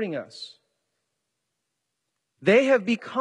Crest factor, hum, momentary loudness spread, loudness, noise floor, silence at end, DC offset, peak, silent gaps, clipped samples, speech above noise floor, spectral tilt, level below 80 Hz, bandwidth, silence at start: 18 dB; none; 22 LU; -22 LUFS; -81 dBFS; 0 s; under 0.1%; -8 dBFS; none; under 0.1%; 58 dB; -5.5 dB/octave; -76 dBFS; 10.5 kHz; 0 s